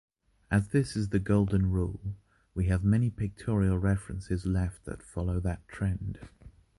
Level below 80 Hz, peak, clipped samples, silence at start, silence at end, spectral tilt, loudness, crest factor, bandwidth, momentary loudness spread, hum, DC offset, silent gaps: -40 dBFS; -14 dBFS; under 0.1%; 0.5 s; 0.3 s; -8 dB/octave; -30 LUFS; 16 dB; 11.5 kHz; 13 LU; none; under 0.1%; none